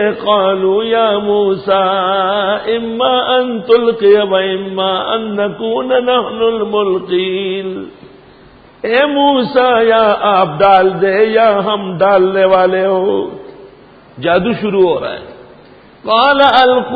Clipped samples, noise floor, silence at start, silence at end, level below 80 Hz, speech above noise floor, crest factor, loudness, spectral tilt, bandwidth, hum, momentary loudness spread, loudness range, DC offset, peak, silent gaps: under 0.1%; -41 dBFS; 0 s; 0 s; -50 dBFS; 29 dB; 12 dB; -12 LUFS; -7.5 dB/octave; 5 kHz; none; 8 LU; 5 LU; under 0.1%; 0 dBFS; none